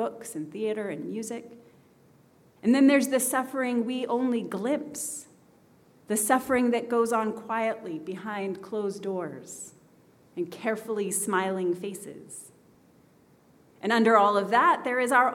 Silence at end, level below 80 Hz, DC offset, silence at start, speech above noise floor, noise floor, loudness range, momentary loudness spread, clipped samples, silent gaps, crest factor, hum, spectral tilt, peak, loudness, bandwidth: 0 s; -74 dBFS; under 0.1%; 0 s; 33 dB; -60 dBFS; 6 LU; 17 LU; under 0.1%; none; 22 dB; none; -4 dB/octave; -6 dBFS; -27 LUFS; 17 kHz